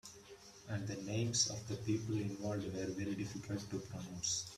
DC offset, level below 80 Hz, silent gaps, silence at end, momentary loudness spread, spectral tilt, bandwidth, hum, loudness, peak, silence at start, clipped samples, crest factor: under 0.1%; -68 dBFS; none; 0 s; 12 LU; -4 dB/octave; 14 kHz; none; -40 LUFS; -20 dBFS; 0.05 s; under 0.1%; 22 dB